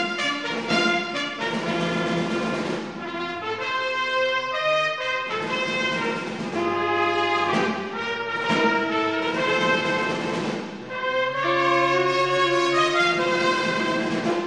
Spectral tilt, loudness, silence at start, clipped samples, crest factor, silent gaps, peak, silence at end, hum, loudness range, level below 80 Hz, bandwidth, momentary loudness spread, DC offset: -4 dB/octave; -23 LUFS; 0 s; under 0.1%; 16 dB; none; -8 dBFS; 0 s; none; 4 LU; -64 dBFS; 10.5 kHz; 8 LU; 0.1%